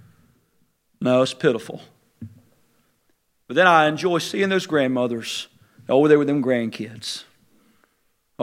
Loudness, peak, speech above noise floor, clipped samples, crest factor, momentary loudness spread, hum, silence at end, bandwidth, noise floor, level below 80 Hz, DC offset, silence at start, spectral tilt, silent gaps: -20 LUFS; 0 dBFS; 47 dB; under 0.1%; 22 dB; 23 LU; none; 0 s; 16 kHz; -67 dBFS; -72 dBFS; under 0.1%; 1 s; -5 dB/octave; none